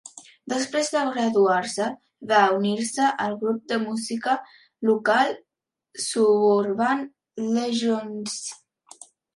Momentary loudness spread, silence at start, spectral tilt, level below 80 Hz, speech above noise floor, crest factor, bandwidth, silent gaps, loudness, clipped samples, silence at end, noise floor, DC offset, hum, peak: 12 LU; 0.05 s; -4 dB/octave; -76 dBFS; 63 dB; 18 dB; 11.5 kHz; none; -23 LUFS; under 0.1%; 0.8 s; -85 dBFS; under 0.1%; none; -6 dBFS